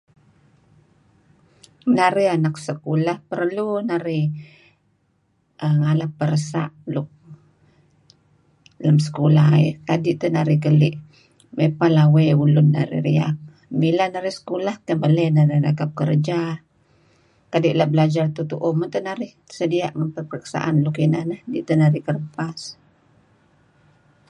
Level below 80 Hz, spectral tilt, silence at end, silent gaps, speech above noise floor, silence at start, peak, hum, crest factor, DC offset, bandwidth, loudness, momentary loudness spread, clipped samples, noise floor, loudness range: -62 dBFS; -8 dB/octave; 1.55 s; none; 46 dB; 1.85 s; -2 dBFS; none; 18 dB; under 0.1%; 10 kHz; -20 LUFS; 13 LU; under 0.1%; -65 dBFS; 7 LU